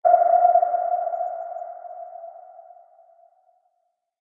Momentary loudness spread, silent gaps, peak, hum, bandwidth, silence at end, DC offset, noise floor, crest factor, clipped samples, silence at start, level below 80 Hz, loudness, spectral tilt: 22 LU; none; -4 dBFS; none; 2.2 kHz; 1.6 s; under 0.1%; -74 dBFS; 20 dB; under 0.1%; 0.05 s; under -90 dBFS; -21 LUFS; -5.5 dB/octave